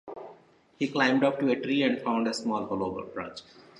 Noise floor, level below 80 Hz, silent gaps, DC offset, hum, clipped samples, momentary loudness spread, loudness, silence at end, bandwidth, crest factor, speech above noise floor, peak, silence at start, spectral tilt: -56 dBFS; -66 dBFS; none; under 0.1%; none; under 0.1%; 19 LU; -28 LUFS; 0.2 s; 11.5 kHz; 20 dB; 29 dB; -10 dBFS; 0.05 s; -5 dB/octave